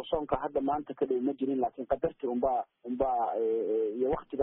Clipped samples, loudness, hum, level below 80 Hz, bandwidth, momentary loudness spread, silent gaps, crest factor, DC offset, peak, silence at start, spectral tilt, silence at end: under 0.1%; -31 LUFS; none; -56 dBFS; 3.8 kHz; 3 LU; none; 16 dB; under 0.1%; -14 dBFS; 0 s; -3.5 dB/octave; 0 s